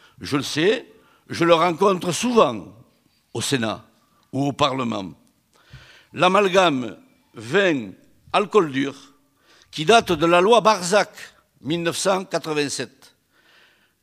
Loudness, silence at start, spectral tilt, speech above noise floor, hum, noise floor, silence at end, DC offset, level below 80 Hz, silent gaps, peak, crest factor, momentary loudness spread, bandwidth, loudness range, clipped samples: -20 LUFS; 0.2 s; -4 dB/octave; 42 dB; none; -61 dBFS; 1.15 s; under 0.1%; -60 dBFS; none; -2 dBFS; 20 dB; 18 LU; 15.5 kHz; 6 LU; under 0.1%